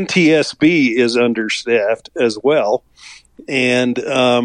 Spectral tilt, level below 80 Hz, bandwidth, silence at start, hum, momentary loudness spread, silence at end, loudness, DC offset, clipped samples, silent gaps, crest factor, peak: -5 dB/octave; -56 dBFS; 11 kHz; 0 s; none; 7 LU; 0 s; -15 LUFS; under 0.1%; under 0.1%; none; 12 dB; -2 dBFS